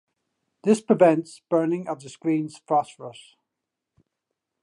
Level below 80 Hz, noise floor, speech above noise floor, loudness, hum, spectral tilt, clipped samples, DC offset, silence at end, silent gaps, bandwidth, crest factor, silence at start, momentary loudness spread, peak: -78 dBFS; -84 dBFS; 61 dB; -23 LUFS; none; -6.5 dB/octave; under 0.1%; under 0.1%; 1.5 s; none; 11.5 kHz; 22 dB; 0.65 s; 17 LU; -4 dBFS